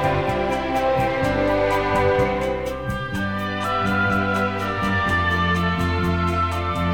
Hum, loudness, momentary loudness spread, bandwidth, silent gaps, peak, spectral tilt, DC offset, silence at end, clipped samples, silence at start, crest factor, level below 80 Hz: none; -21 LUFS; 5 LU; 18 kHz; none; -8 dBFS; -6.5 dB/octave; 0.6%; 0 s; under 0.1%; 0 s; 14 dB; -36 dBFS